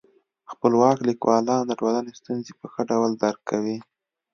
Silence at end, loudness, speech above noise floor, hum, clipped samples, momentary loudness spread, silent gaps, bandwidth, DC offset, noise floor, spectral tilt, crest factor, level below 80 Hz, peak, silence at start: 0.5 s; -23 LUFS; 23 dB; none; under 0.1%; 13 LU; none; 7 kHz; under 0.1%; -45 dBFS; -6 dB/octave; 20 dB; -70 dBFS; -4 dBFS; 0.5 s